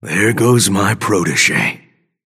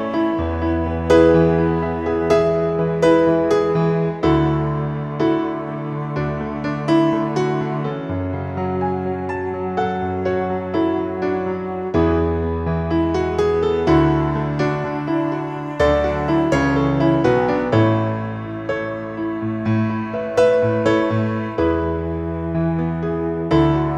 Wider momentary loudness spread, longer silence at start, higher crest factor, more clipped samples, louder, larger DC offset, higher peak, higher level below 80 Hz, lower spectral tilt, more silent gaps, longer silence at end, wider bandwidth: second, 6 LU vs 9 LU; about the same, 0.05 s vs 0 s; about the same, 16 dB vs 16 dB; neither; first, -13 LUFS vs -19 LUFS; neither; about the same, 0 dBFS vs -2 dBFS; second, -54 dBFS vs -36 dBFS; second, -4 dB/octave vs -8 dB/octave; neither; first, 0.55 s vs 0 s; first, 16 kHz vs 8.6 kHz